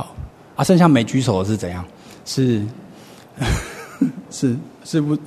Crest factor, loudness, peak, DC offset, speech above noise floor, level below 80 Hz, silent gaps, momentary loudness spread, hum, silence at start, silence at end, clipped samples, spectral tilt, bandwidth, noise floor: 18 dB; -19 LUFS; -2 dBFS; under 0.1%; 24 dB; -38 dBFS; none; 19 LU; none; 0 s; 0 s; under 0.1%; -6 dB/octave; 13.5 kHz; -42 dBFS